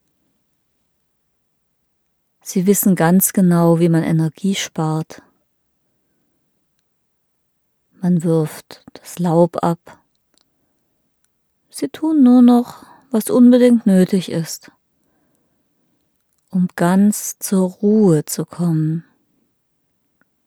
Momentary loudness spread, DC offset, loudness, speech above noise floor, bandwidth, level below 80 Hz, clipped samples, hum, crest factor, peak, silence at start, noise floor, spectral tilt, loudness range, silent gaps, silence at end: 16 LU; under 0.1%; -16 LUFS; 53 dB; 17.5 kHz; -66 dBFS; under 0.1%; none; 18 dB; 0 dBFS; 2.45 s; -68 dBFS; -6.5 dB/octave; 10 LU; none; 1.45 s